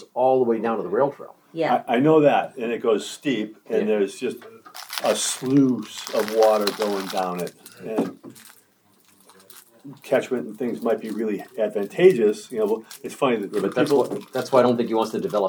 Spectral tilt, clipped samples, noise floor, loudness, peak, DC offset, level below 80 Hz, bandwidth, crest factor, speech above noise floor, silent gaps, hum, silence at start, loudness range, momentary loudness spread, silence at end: -5 dB/octave; under 0.1%; -59 dBFS; -22 LUFS; -4 dBFS; under 0.1%; -78 dBFS; over 20 kHz; 20 dB; 38 dB; none; none; 0 s; 8 LU; 13 LU; 0 s